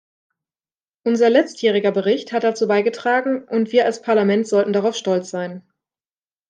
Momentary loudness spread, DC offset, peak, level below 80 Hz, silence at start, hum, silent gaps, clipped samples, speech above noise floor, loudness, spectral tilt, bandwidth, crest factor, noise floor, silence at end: 7 LU; under 0.1%; -2 dBFS; -74 dBFS; 1.05 s; none; none; under 0.1%; over 72 dB; -19 LUFS; -5 dB/octave; 9.6 kHz; 18 dB; under -90 dBFS; 0.9 s